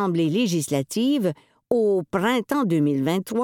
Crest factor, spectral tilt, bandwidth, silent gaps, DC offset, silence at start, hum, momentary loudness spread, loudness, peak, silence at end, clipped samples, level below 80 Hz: 16 dB; -6 dB/octave; 18 kHz; none; under 0.1%; 0 s; none; 4 LU; -23 LUFS; -6 dBFS; 0 s; under 0.1%; -64 dBFS